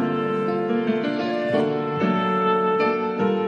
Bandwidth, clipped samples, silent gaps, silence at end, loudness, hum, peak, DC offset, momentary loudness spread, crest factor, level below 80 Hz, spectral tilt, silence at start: 7 kHz; under 0.1%; none; 0 s; -22 LUFS; none; -8 dBFS; under 0.1%; 4 LU; 14 dB; -70 dBFS; -8 dB/octave; 0 s